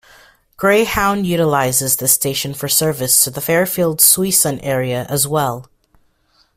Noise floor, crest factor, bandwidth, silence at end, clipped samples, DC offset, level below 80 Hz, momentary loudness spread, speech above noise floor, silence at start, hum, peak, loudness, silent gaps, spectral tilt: -58 dBFS; 16 dB; 16 kHz; 0.95 s; under 0.1%; under 0.1%; -46 dBFS; 9 LU; 42 dB; 0.6 s; none; 0 dBFS; -14 LUFS; none; -3 dB/octave